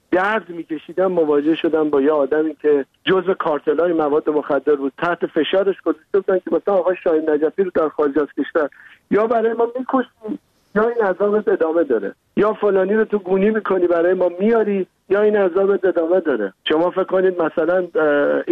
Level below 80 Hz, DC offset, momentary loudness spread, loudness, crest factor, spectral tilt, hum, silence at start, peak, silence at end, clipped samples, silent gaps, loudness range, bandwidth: -58 dBFS; under 0.1%; 5 LU; -18 LUFS; 12 dB; -8 dB/octave; none; 0.1 s; -6 dBFS; 0 s; under 0.1%; none; 2 LU; 4.6 kHz